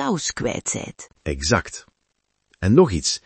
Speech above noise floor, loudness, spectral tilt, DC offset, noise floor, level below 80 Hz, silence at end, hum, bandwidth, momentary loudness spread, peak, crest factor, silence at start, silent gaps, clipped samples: 52 dB; -21 LUFS; -4.5 dB/octave; under 0.1%; -73 dBFS; -42 dBFS; 0.1 s; none; 8.8 kHz; 19 LU; -2 dBFS; 20 dB; 0 s; none; under 0.1%